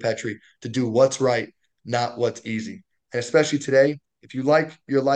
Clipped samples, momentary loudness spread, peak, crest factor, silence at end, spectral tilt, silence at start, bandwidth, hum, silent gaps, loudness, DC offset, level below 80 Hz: under 0.1%; 15 LU; -4 dBFS; 18 dB; 0 s; -5 dB/octave; 0 s; 9.6 kHz; none; none; -23 LUFS; under 0.1%; -68 dBFS